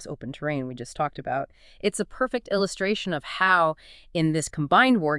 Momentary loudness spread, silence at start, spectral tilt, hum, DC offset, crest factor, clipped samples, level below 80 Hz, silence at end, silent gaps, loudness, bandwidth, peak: 13 LU; 0 s; -4.5 dB/octave; none; under 0.1%; 20 dB; under 0.1%; -54 dBFS; 0 s; none; -25 LUFS; 12 kHz; -6 dBFS